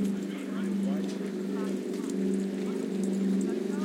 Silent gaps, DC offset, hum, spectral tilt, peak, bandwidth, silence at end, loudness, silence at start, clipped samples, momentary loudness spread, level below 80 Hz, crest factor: none; under 0.1%; none; -7 dB/octave; -18 dBFS; 15.5 kHz; 0 s; -31 LUFS; 0 s; under 0.1%; 5 LU; -74 dBFS; 12 dB